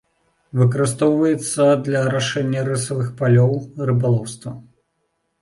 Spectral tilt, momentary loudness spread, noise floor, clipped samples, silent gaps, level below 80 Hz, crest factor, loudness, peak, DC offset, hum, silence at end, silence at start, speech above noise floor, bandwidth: -6 dB/octave; 10 LU; -71 dBFS; under 0.1%; none; -56 dBFS; 14 dB; -19 LUFS; -4 dBFS; under 0.1%; none; 0.8 s; 0.55 s; 53 dB; 11.5 kHz